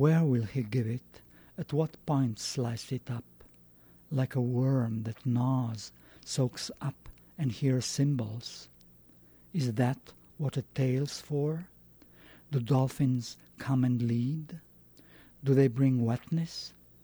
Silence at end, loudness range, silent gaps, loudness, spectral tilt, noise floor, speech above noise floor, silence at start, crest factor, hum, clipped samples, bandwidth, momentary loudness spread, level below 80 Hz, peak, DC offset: 0.35 s; 4 LU; none; -31 LUFS; -7 dB/octave; -58 dBFS; 28 dB; 0 s; 18 dB; 60 Hz at -60 dBFS; under 0.1%; over 20 kHz; 14 LU; -64 dBFS; -12 dBFS; under 0.1%